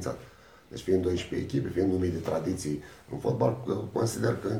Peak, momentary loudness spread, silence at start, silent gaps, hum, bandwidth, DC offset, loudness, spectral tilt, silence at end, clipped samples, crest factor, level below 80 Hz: -12 dBFS; 11 LU; 0 s; none; none; 16.5 kHz; under 0.1%; -30 LUFS; -6.5 dB/octave; 0 s; under 0.1%; 18 dB; -56 dBFS